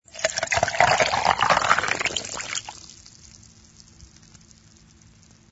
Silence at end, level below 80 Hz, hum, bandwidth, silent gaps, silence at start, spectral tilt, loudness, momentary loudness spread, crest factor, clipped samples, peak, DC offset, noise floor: 1.45 s; -52 dBFS; none; 8.2 kHz; none; 0.15 s; -1.5 dB/octave; -22 LUFS; 14 LU; 24 dB; under 0.1%; -2 dBFS; under 0.1%; -53 dBFS